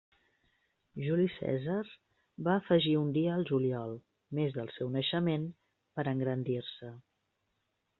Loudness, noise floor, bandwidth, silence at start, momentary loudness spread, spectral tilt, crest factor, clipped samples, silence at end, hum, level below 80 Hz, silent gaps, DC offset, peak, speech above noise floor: -33 LUFS; -81 dBFS; 4.3 kHz; 0.95 s; 16 LU; -6 dB/octave; 20 dB; under 0.1%; 1 s; none; -72 dBFS; none; under 0.1%; -14 dBFS; 49 dB